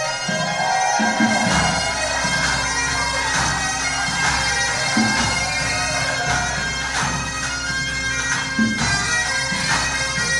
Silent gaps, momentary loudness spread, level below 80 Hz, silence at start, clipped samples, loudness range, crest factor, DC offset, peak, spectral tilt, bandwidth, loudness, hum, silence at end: none; 4 LU; -36 dBFS; 0 s; under 0.1%; 2 LU; 14 dB; under 0.1%; -6 dBFS; -2.5 dB/octave; 11.5 kHz; -19 LUFS; none; 0 s